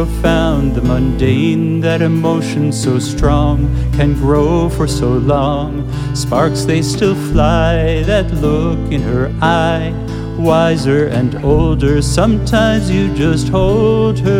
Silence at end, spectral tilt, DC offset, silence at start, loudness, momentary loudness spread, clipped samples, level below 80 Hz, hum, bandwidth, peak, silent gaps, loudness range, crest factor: 0 s; -6.5 dB/octave; under 0.1%; 0 s; -14 LUFS; 4 LU; under 0.1%; -22 dBFS; none; 16 kHz; 0 dBFS; none; 1 LU; 12 dB